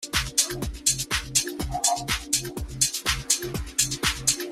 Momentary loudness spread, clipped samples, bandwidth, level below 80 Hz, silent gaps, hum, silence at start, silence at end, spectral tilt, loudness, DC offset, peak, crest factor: 4 LU; under 0.1%; 16 kHz; -40 dBFS; none; none; 0 s; 0 s; -1.5 dB/octave; -24 LUFS; under 0.1%; -4 dBFS; 22 dB